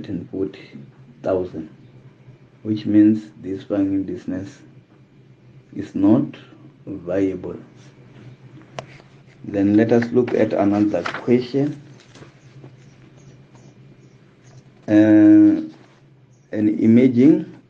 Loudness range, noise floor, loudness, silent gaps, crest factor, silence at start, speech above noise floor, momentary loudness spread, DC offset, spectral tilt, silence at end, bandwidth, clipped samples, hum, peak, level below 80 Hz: 9 LU; -51 dBFS; -18 LUFS; none; 18 dB; 0 s; 34 dB; 24 LU; under 0.1%; -8.5 dB/octave; 0.15 s; 7 kHz; under 0.1%; none; -2 dBFS; -56 dBFS